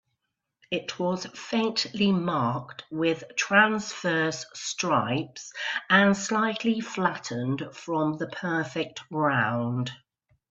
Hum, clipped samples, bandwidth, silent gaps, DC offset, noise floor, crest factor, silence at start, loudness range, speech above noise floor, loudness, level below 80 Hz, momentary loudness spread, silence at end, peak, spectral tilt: none; under 0.1%; 8 kHz; none; under 0.1%; -81 dBFS; 22 dB; 0.7 s; 4 LU; 55 dB; -27 LUFS; -68 dBFS; 12 LU; 0.55 s; -6 dBFS; -4.5 dB/octave